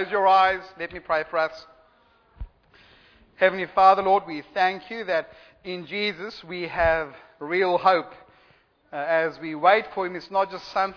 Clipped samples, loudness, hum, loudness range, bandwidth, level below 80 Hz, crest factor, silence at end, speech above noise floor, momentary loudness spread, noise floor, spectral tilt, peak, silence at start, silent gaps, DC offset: under 0.1%; -23 LUFS; none; 4 LU; 5.4 kHz; -50 dBFS; 22 dB; 0 s; 37 dB; 17 LU; -60 dBFS; -5.5 dB/octave; -4 dBFS; 0 s; none; under 0.1%